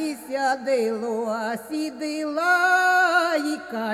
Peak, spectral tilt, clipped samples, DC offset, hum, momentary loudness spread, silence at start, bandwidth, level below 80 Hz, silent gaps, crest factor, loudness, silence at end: -8 dBFS; -3 dB/octave; under 0.1%; under 0.1%; none; 11 LU; 0 s; 15.5 kHz; -70 dBFS; none; 14 dB; -22 LUFS; 0 s